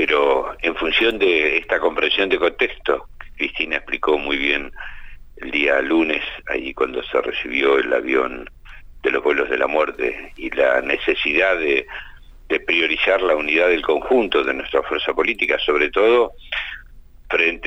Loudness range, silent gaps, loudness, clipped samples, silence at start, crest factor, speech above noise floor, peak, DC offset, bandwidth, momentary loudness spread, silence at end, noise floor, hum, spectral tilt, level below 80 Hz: 3 LU; none; -19 LUFS; under 0.1%; 0 s; 16 dB; 23 dB; -4 dBFS; under 0.1%; 8.2 kHz; 9 LU; 0 s; -42 dBFS; none; -4.5 dB/octave; -42 dBFS